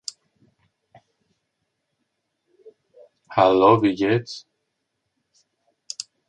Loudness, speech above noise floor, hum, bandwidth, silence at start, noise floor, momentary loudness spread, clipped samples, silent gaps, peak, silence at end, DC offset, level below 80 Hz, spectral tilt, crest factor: -18 LUFS; 59 dB; none; 11 kHz; 3.3 s; -77 dBFS; 21 LU; under 0.1%; none; -2 dBFS; 1.9 s; under 0.1%; -62 dBFS; -5.5 dB/octave; 22 dB